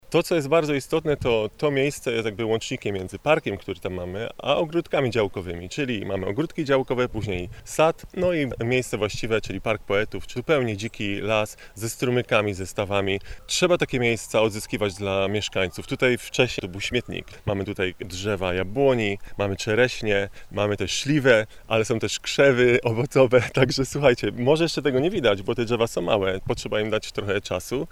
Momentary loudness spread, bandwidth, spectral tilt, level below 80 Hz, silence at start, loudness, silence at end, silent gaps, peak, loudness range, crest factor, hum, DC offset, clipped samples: 8 LU; 16 kHz; -5 dB/octave; -46 dBFS; 0.1 s; -24 LUFS; 0 s; none; -2 dBFS; 5 LU; 20 dB; none; under 0.1%; under 0.1%